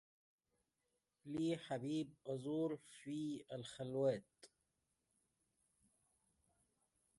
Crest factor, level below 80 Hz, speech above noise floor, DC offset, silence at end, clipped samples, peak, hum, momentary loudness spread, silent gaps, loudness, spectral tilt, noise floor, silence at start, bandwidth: 20 dB; -84 dBFS; 45 dB; under 0.1%; 2.7 s; under 0.1%; -28 dBFS; none; 9 LU; none; -44 LUFS; -6.5 dB/octave; -89 dBFS; 1.25 s; 11.5 kHz